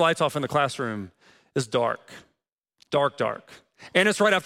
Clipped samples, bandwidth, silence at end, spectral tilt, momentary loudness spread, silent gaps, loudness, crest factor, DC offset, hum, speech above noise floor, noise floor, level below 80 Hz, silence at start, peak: under 0.1%; 16 kHz; 0 s; -4 dB/octave; 14 LU; 2.53-2.58 s; -25 LUFS; 20 dB; under 0.1%; none; 54 dB; -78 dBFS; -68 dBFS; 0 s; -6 dBFS